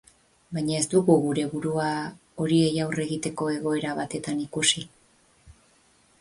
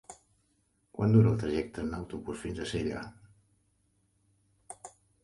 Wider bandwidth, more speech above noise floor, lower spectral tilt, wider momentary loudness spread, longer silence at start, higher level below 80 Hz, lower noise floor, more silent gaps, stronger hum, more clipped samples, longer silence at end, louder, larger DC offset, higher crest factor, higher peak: about the same, 11.5 kHz vs 11.5 kHz; second, 36 dB vs 44 dB; second, -4.5 dB/octave vs -7.5 dB/octave; second, 9 LU vs 23 LU; first, 0.5 s vs 0.1 s; second, -62 dBFS vs -54 dBFS; second, -61 dBFS vs -73 dBFS; neither; neither; neither; first, 0.7 s vs 0.35 s; first, -25 LUFS vs -31 LUFS; neither; about the same, 20 dB vs 22 dB; first, -6 dBFS vs -12 dBFS